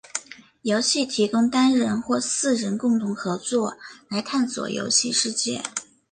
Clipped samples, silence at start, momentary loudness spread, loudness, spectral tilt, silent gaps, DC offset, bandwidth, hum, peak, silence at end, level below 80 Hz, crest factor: under 0.1%; 0.15 s; 11 LU; -23 LUFS; -3 dB/octave; none; under 0.1%; 10 kHz; none; -6 dBFS; 0.3 s; -66 dBFS; 16 dB